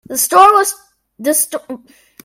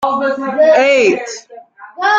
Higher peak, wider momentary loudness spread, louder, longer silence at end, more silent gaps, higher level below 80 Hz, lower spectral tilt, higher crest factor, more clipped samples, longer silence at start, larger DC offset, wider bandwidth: about the same, 0 dBFS vs -2 dBFS; first, 23 LU vs 15 LU; about the same, -12 LUFS vs -12 LUFS; first, 0.5 s vs 0 s; neither; about the same, -58 dBFS vs -62 dBFS; second, -1 dB/octave vs -3 dB/octave; about the same, 14 dB vs 12 dB; first, 0.2% vs under 0.1%; about the same, 0.1 s vs 0 s; neither; first, 16.5 kHz vs 7.8 kHz